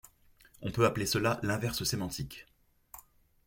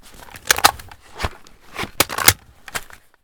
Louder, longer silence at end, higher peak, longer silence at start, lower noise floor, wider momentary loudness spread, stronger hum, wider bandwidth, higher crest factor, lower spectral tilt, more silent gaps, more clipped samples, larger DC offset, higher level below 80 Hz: second, -32 LUFS vs -17 LUFS; about the same, 0.45 s vs 0.4 s; second, -12 dBFS vs 0 dBFS; first, 0.6 s vs 0.35 s; first, -62 dBFS vs -40 dBFS; first, 23 LU vs 19 LU; neither; second, 17 kHz vs over 20 kHz; about the same, 22 dB vs 22 dB; first, -4.5 dB/octave vs -1 dB/octave; neither; second, under 0.1% vs 0.1%; neither; second, -56 dBFS vs -40 dBFS